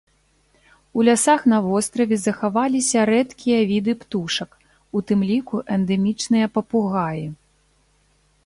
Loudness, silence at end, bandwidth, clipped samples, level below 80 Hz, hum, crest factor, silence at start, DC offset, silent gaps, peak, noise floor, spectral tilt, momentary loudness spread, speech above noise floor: -20 LUFS; 1.1 s; 11.5 kHz; under 0.1%; -58 dBFS; 50 Hz at -55 dBFS; 16 dB; 0.95 s; under 0.1%; none; -4 dBFS; -61 dBFS; -4.5 dB/octave; 10 LU; 42 dB